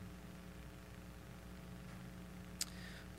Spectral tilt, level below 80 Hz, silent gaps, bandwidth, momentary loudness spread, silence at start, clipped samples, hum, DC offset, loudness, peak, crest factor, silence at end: -3.5 dB/octave; -60 dBFS; none; 16 kHz; 10 LU; 0 s; under 0.1%; none; under 0.1%; -51 LUFS; -18 dBFS; 34 dB; 0 s